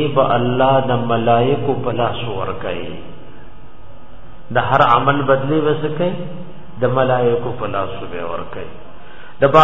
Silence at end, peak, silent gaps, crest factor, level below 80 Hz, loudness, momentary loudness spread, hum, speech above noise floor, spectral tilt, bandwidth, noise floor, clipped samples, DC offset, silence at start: 0 s; 0 dBFS; none; 18 dB; -44 dBFS; -17 LUFS; 17 LU; none; 23 dB; -8 dB/octave; 7.2 kHz; -40 dBFS; under 0.1%; 5%; 0 s